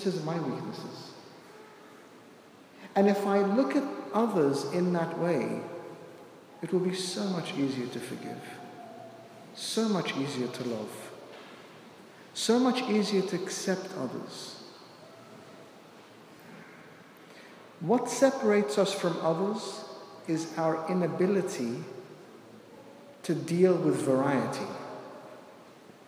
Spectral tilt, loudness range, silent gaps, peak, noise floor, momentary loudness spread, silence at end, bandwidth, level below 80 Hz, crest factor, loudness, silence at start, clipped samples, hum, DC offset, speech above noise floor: -5.5 dB/octave; 6 LU; none; -10 dBFS; -53 dBFS; 25 LU; 0.15 s; 16 kHz; -84 dBFS; 22 dB; -30 LUFS; 0 s; under 0.1%; none; under 0.1%; 25 dB